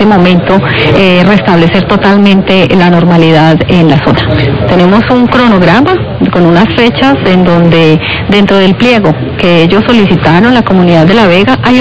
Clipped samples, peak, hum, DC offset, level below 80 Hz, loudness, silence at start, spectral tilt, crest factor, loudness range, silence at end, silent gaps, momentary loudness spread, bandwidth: 10%; 0 dBFS; none; 3%; -28 dBFS; -5 LUFS; 0 s; -7.5 dB/octave; 4 dB; 1 LU; 0 s; none; 3 LU; 8 kHz